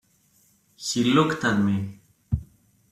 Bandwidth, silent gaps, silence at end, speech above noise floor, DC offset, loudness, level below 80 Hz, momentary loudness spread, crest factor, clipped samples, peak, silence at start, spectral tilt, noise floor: 14 kHz; none; 0.45 s; 40 dB; under 0.1%; -24 LUFS; -46 dBFS; 12 LU; 18 dB; under 0.1%; -8 dBFS; 0.8 s; -5 dB/octave; -62 dBFS